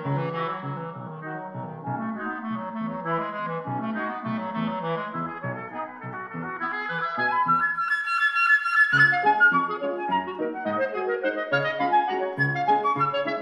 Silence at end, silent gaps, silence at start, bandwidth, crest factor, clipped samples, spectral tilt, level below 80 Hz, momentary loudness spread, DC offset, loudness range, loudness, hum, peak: 0 s; none; 0 s; 12 kHz; 18 dB; under 0.1%; -6.5 dB/octave; -74 dBFS; 16 LU; under 0.1%; 10 LU; -25 LUFS; none; -8 dBFS